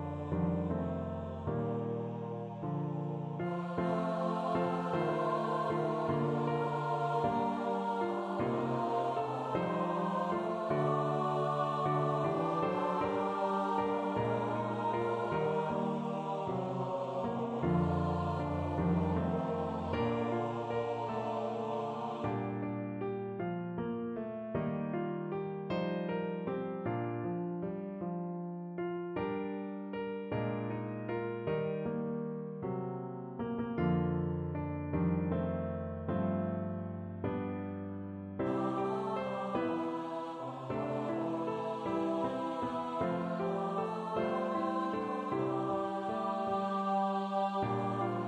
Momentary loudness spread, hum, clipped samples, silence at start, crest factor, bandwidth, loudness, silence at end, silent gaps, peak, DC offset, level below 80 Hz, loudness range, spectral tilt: 7 LU; none; under 0.1%; 0 s; 14 dB; 9.2 kHz; -35 LUFS; 0 s; none; -20 dBFS; under 0.1%; -60 dBFS; 5 LU; -8.5 dB/octave